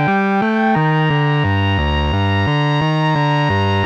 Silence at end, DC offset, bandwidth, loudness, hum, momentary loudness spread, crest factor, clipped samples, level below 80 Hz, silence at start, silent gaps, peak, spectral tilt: 0 s; under 0.1%; 7 kHz; -16 LUFS; none; 2 LU; 10 dB; under 0.1%; -30 dBFS; 0 s; none; -6 dBFS; -7.5 dB/octave